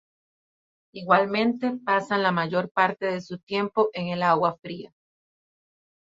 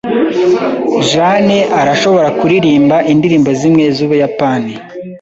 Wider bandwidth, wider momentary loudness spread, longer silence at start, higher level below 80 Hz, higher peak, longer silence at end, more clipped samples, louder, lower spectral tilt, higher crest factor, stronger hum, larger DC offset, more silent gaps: about the same, 7.8 kHz vs 8 kHz; first, 15 LU vs 5 LU; first, 0.95 s vs 0.05 s; second, -70 dBFS vs -48 dBFS; second, -6 dBFS vs 0 dBFS; first, 1.3 s vs 0.05 s; neither; second, -24 LUFS vs -10 LUFS; about the same, -6.5 dB/octave vs -6 dB/octave; first, 20 dB vs 10 dB; neither; neither; first, 2.71-2.75 s, 3.43-3.47 s vs none